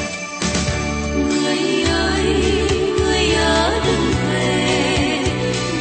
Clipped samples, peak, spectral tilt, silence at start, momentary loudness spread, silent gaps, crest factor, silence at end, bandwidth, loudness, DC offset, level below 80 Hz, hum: under 0.1%; -4 dBFS; -4.5 dB/octave; 0 s; 5 LU; none; 14 dB; 0 s; 8.8 kHz; -18 LUFS; under 0.1%; -30 dBFS; none